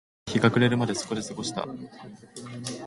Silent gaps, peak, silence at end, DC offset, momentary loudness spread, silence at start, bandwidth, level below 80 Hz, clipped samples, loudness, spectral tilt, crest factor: none; -6 dBFS; 0 s; under 0.1%; 22 LU; 0.25 s; 11.5 kHz; -60 dBFS; under 0.1%; -27 LUFS; -5 dB/octave; 22 dB